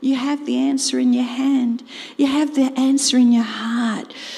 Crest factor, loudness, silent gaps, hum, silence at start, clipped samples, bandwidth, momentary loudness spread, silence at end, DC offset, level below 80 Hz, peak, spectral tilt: 12 dB; -18 LUFS; none; none; 0 s; under 0.1%; 12.5 kHz; 9 LU; 0 s; under 0.1%; -70 dBFS; -6 dBFS; -3 dB/octave